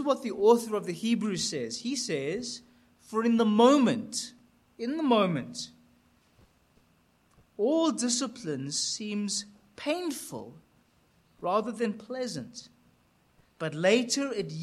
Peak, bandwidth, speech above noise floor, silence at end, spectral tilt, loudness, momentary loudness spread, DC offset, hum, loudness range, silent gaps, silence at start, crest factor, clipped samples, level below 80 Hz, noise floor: -8 dBFS; 13.5 kHz; 38 dB; 0 s; -4 dB/octave; -28 LUFS; 16 LU; under 0.1%; none; 8 LU; none; 0 s; 20 dB; under 0.1%; -72 dBFS; -66 dBFS